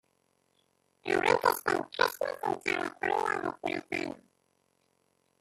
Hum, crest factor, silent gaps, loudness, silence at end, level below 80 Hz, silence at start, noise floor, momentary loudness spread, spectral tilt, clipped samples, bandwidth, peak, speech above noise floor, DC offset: none; 24 dB; none; -30 LUFS; 1.25 s; -70 dBFS; 1.05 s; -74 dBFS; 9 LU; -3.5 dB/octave; under 0.1%; 15 kHz; -8 dBFS; 41 dB; under 0.1%